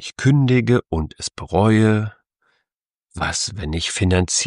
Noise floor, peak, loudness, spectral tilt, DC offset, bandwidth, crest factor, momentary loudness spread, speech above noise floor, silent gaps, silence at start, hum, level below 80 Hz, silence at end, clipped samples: -83 dBFS; -2 dBFS; -19 LUFS; -5 dB/octave; under 0.1%; 11 kHz; 16 dB; 12 LU; 64 dB; 2.76-2.80 s, 2.86-3.01 s; 0 s; none; -38 dBFS; 0 s; under 0.1%